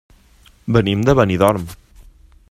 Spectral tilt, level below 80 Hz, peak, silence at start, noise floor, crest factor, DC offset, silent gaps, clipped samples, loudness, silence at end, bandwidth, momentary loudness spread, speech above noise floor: -7 dB/octave; -38 dBFS; 0 dBFS; 0.65 s; -50 dBFS; 18 dB; under 0.1%; none; under 0.1%; -16 LUFS; 0.75 s; 15.5 kHz; 17 LU; 35 dB